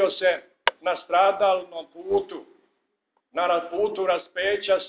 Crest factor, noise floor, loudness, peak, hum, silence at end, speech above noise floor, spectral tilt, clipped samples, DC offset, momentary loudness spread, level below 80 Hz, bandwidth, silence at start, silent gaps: 24 dB; -74 dBFS; -24 LUFS; 0 dBFS; none; 0 s; 50 dB; -7 dB/octave; under 0.1%; under 0.1%; 14 LU; -68 dBFS; 4 kHz; 0 s; none